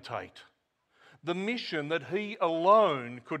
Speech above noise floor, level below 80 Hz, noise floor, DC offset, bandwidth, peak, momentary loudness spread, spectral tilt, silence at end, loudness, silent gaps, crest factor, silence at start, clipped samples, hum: 42 dB; -80 dBFS; -71 dBFS; under 0.1%; 9.2 kHz; -10 dBFS; 17 LU; -6 dB/octave; 0 s; -29 LUFS; none; 20 dB; 0.05 s; under 0.1%; none